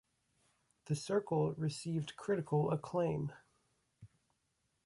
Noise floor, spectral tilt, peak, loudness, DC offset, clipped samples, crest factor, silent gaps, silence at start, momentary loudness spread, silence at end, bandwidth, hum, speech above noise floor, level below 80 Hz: -82 dBFS; -7 dB/octave; -22 dBFS; -37 LUFS; under 0.1%; under 0.1%; 18 dB; none; 0.85 s; 7 LU; 0.8 s; 11.5 kHz; none; 45 dB; -70 dBFS